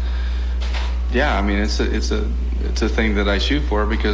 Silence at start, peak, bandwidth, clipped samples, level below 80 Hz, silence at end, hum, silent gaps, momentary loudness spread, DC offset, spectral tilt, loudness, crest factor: 0 s; -4 dBFS; 7.8 kHz; under 0.1%; -20 dBFS; 0 s; none; none; 5 LU; under 0.1%; -5.5 dB/octave; -20 LUFS; 14 dB